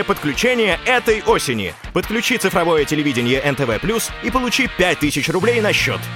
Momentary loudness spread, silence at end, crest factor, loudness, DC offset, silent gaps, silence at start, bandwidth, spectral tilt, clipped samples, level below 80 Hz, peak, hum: 5 LU; 0 s; 14 dB; -17 LUFS; under 0.1%; none; 0 s; 17 kHz; -4 dB/octave; under 0.1%; -38 dBFS; -4 dBFS; none